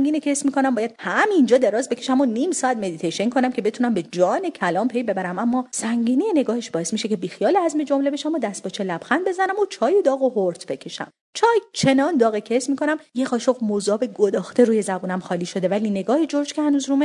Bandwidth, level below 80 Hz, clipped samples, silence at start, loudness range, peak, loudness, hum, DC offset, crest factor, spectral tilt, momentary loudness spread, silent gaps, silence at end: 11 kHz; -70 dBFS; under 0.1%; 0 s; 2 LU; -2 dBFS; -21 LUFS; none; under 0.1%; 18 dB; -4.5 dB/octave; 7 LU; 11.21-11.33 s; 0 s